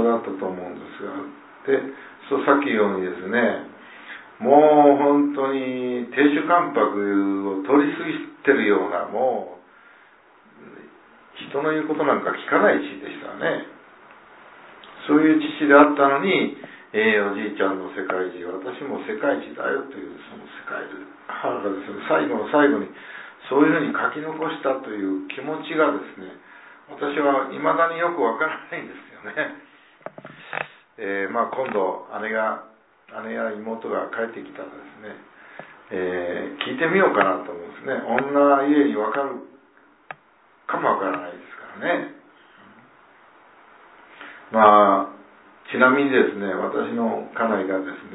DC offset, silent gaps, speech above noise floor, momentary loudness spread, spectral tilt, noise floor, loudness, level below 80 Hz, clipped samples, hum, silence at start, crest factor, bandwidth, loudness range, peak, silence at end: under 0.1%; none; 35 dB; 21 LU; -9.5 dB/octave; -56 dBFS; -21 LUFS; -74 dBFS; under 0.1%; none; 0 s; 22 dB; 4 kHz; 10 LU; 0 dBFS; 0 s